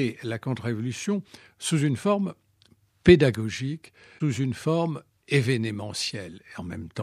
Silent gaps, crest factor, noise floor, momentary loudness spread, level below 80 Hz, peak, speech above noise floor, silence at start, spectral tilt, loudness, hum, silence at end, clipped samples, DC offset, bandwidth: none; 24 dB; -62 dBFS; 18 LU; -52 dBFS; -2 dBFS; 36 dB; 0 s; -6 dB/octave; -26 LUFS; none; 0 s; under 0.1%; under 0.1%; 13.5 kHz